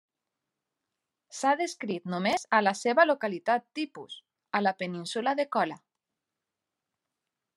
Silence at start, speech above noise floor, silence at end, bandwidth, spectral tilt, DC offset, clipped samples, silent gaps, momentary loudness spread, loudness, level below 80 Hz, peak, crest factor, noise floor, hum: 1.3 s; 59 dB; 1.8 s; 12.5 kHz; -4 dB/octave; under 0.1%; under 0.1%; none; 15 LU; -28 LUFS; -84 dBFS; -8 dBFS; 22 dB; -87 dBFS; none